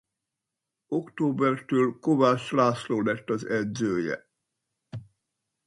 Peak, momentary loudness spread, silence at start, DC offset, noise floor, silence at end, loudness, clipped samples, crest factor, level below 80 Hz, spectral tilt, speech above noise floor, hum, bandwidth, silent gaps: -8 dBFS; 15 LU; 0.9 s; under 0.1%; -86 dBFS; 0.65 s; -26 LUFS; under 0.1%; 20 dB; -68 dBFS; -6.5 dB/octave; 61 dB; none; 11.5 kHz; none